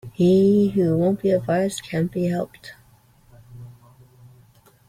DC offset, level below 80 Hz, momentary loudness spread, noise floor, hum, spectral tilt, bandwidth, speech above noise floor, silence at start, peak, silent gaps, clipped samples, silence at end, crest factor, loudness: under 0.1%; -56 dBFS; 14 LU; -55 dBFS; none; -7.5 dB/octave; 15.5 kHz; 35 dB; 0.05 s; -8 dBFS; none; under 0.1%; 1.15 s; 14 dB; -20 LUFS